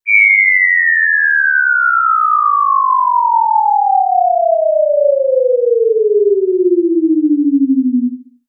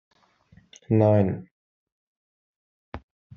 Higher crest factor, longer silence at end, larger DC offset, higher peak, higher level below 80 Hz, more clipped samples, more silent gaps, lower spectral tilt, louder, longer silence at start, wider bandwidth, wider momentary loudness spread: second, 10 dB vs 22 dB; second, 0.25 s vs 0.4 s; neither; first, 0 dBFS vs -6 dBFS; second, under -90 dBFS vs -58 dBFS; neither; second, none vs 1.51-2.92 s; first, -11.5 dB/octave vs -9.5 dB/octave; first, -11 LUFS vs -22 LUFS; second, 0.05 s vs 0.9 s; second, 2.6 kHz vs 6.8 kHz; second, 5 LU vs 24 LU